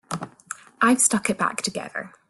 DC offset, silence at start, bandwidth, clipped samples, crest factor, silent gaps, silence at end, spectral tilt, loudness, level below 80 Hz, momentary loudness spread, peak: under 0.1%; 0.1 s; 12.5 kHz; under 0.1%; 22 dB; none; 0.2 s; -2.5 dB/octave; -21 LUFS; -64 dBFS; 19 LU; -4 dBFS